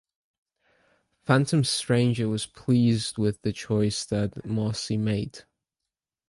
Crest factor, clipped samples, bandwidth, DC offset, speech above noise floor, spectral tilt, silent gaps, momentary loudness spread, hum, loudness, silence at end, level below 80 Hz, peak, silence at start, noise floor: 20 dB; under 0.1%; 11.5 kHz; under 0.1%; 63 dB; -5.5 dB/octave; none; 8 LU; none; -26 LUFS; 0.85 s; -54 dBFS; -6 dBFS; 1.3 s; -88 dBFS